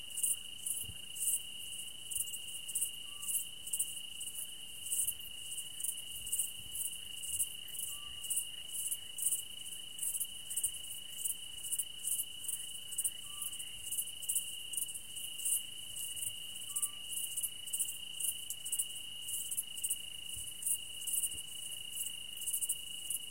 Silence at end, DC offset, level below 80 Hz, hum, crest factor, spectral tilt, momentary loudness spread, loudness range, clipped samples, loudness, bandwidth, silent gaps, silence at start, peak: 0 s; 0.3%; -70 dBFS; none; 22 dB; 2 dB/octave; 8 LU; 1 LU; under 0.1%; -37 LUFS; 17 kHz; none; 0 s; -18 dBFS